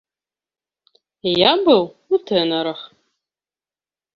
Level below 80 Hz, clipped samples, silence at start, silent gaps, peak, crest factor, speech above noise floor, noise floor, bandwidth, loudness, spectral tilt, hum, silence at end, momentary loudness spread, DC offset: -62 dBFS; under 0.1%; 1.25 s; none; -2 dBFS; 20 dB; over 73 dB; under -90 dBFS; 6.6 kHz; -18 LUFS; -6.5 dB/octave; none; 1.3 s; 13 LU; under 0.1%